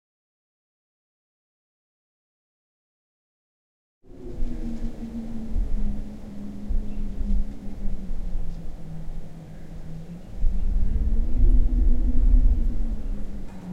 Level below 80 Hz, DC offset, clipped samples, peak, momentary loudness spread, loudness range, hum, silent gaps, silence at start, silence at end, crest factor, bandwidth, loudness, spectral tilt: -24 dBFS; under 0.1%; under 0.1%; -6 dBFS; 16 LU; 13 LU; none; none; 4.15 s; 0 s; 16 dB; 2.3 kHz; -30 LUFS; -9 dB/octave